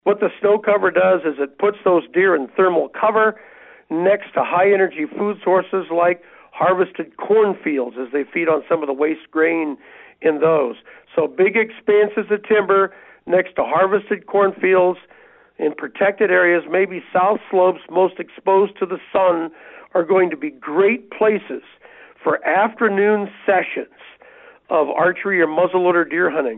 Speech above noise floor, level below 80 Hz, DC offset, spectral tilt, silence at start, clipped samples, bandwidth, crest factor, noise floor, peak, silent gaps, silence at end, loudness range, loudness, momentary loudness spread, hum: 28 dB; -68 dBFS; under 0.1%; -4 dB/octave; 0.05 s; under 0.1%; 4 kHz; 12 dB; -46 dBFS; -6 dBFS; none; 0 s; 2 LU; -18 LUFS; 8 LU; none